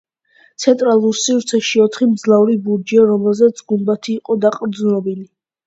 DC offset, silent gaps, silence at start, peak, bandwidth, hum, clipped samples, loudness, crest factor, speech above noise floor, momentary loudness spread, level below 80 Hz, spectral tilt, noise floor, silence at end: under 0.1%; none; 0.6 s; 0 dBFS; 8 kHz; none; under 0.1%; -15 LUFS; 14 dB; 39 dB; 7 LU; -64 dBFS; -5 dB/octave; -53 dBFS; 0.45 s